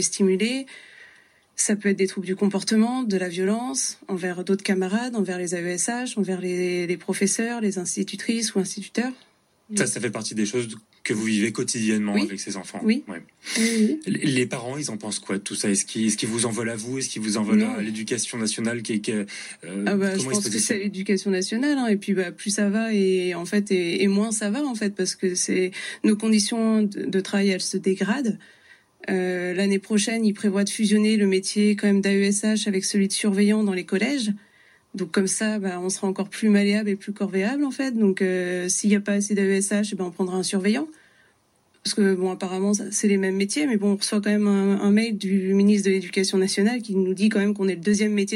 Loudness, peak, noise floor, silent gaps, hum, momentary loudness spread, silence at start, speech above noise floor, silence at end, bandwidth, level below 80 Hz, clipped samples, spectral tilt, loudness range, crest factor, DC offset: -23 LUFS; -8 dBFS; -63 dBFS; none; none; 7 LU; 0 s; 40 dB; 0 s; 12.5 kHz; -74 dBFS; under 0.1%; -4.5 dB/octave; 4 LU; 16 dB; under 0.1%